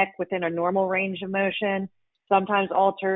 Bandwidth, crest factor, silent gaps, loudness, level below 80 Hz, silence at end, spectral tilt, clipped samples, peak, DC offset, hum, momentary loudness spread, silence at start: 4 kHz; 18 dB; none; -24 LUFS; -68 dBFS; 0 s; -10 dB/octave; under 0.1%; -8 dBFS; under 0.1%; none; 6 LU; 0 s